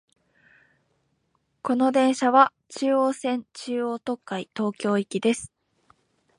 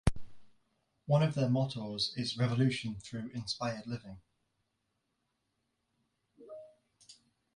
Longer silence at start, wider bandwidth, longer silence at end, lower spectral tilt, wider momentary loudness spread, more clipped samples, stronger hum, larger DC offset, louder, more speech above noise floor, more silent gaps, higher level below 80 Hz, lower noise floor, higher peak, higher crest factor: first, 1.65 s vs 0.05 s; about the same, 11 kHz vs 11.5 kHz; first, 0.9 s vs 0.4 s; about the same, -5 dB/octave vs -6 dB/octave; second, 12 LU vs 21 LU; neither; neither; neither; first, -24 LUFS vs -34 LUFS; about the same, 49 dB vs 49 dB; neither; second, -70 dBFS vs -52 dBFS; second, -72 dBFS vs -82 dBFS; first, -2 dBFS vs -12 dBFS; about the same, 24 dB vs 24 dB